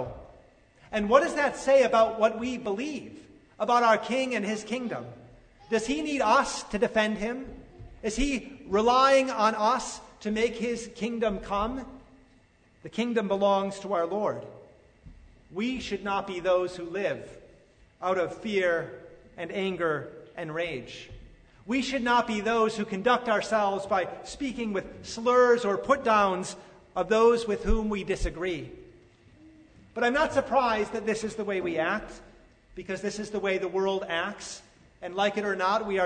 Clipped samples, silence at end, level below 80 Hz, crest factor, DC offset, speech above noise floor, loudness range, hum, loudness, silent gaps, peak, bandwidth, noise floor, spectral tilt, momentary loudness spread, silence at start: under 0.1%; 0 s; -46 dBFS; 22 dB; under 0.1%; 34 dB; 6 LU; none; -27 LUFS; none; -6 dBFS; 9.6 kHz; -61 dBFS; -4.5 dB/octave; 16 LU; 0 s